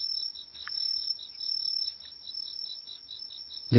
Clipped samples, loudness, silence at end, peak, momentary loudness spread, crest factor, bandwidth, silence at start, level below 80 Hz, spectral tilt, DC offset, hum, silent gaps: under 0.1%; -32 LUFS; 0 s; -6 dBFS; 12 LU; 26 dB; 6 kHz; 0 s; -64 dBFS; -7.5 dB/octave; under 0.1%; none; none